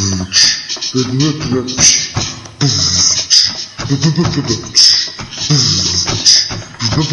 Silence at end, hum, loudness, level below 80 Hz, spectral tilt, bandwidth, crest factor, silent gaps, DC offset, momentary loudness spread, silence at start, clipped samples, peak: 0 s; none; -11 LUFS; -40 dBFS; -2.5 dB/octave; 12 kHz; 14 dB; none; under 0.1%; 11 LU; 0 s; 0.3%; 0 dBFS